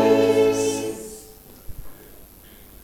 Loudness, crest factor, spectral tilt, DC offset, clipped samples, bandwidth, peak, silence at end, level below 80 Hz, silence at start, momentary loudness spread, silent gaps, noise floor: -20 LUFS; 16 dB; -4.5 dB/octave; under 0.1%; under 0.1%; 18 kHz; -6 dBFS; 0.6 s; -48 dBFS; 0 s; 26 LU; none; -46 dBFS